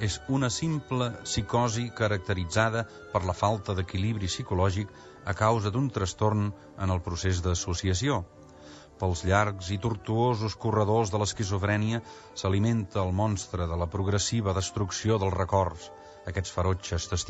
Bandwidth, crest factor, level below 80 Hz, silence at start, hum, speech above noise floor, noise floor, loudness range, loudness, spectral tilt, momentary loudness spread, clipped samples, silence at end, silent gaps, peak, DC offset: 8.6 kHz; 18 dB; -46 dBFS; 0 s; none; 21 dB; -49 dBFS; 2 LU; -29 LUFS; -5.5 dB/octave; 8 LU; under 0.1%; 0 s; none; -10 dBFS; under 0.1%